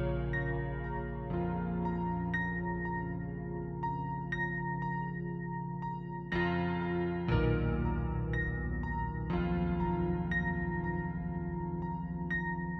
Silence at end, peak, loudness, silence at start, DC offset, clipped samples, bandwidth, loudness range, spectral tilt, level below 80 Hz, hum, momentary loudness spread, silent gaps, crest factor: 0 s; -18 dBFS; -35 LUFS; 0 s; under 0.1%; under 0.1%; 5.8 kHz; 3 LU; -9.5 dB/octave; -44 dBFS; none; 6 LU; none; 16 dB